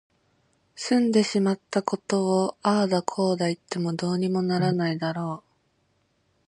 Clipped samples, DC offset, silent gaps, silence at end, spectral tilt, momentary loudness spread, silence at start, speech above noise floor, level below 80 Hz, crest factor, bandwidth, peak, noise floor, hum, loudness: under 0.1%; under 0.1%; none; 1.1 s; -6 dB/octave; 7 LU; 0.75 s; 45 dB; -70 dBFS; 20 dB; 10.5 kHz; -6 dBFS; -69 dBFS; none; -25 LUFS